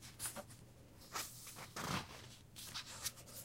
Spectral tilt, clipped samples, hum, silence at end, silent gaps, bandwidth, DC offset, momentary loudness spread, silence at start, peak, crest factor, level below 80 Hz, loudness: -2.5 dB/octave; under 0.1%; none; 0 s; none; 16 kHz; under 0.1%; 15 LU; 0 s; -26 dBFS; 22 dB; -68 dBFS; -47 LUFS